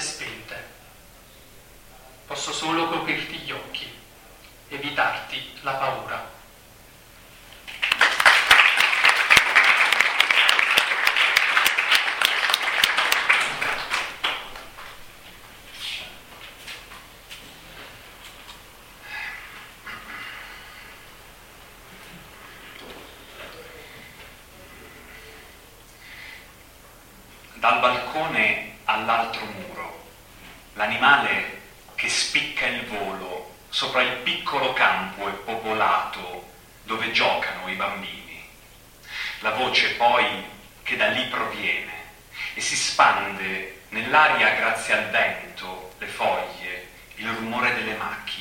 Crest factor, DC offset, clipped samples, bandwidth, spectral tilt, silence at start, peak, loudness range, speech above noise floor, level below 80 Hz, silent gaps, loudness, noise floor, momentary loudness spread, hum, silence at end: 24 dB; under 0.1%; under 0.1%; 16.5 kHz; -1 dB/octave; 0 s; 0 dBFS; 23 LU; 25 dB; -54 dBFS; none; -21 LUFS; -49 dBFS; 25 LU; none; 0 s